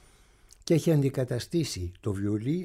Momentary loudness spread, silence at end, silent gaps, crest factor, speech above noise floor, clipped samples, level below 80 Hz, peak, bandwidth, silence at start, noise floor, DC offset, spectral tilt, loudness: 10 LU; 0 s; none; 16 dB; 31 dB; under 0.1%; -54 dBFS; -14 dBFS; 16 kHz; 0.65 s; -58 dBFS; under 0.1%; -6.5 dB/octave; -28 LUFS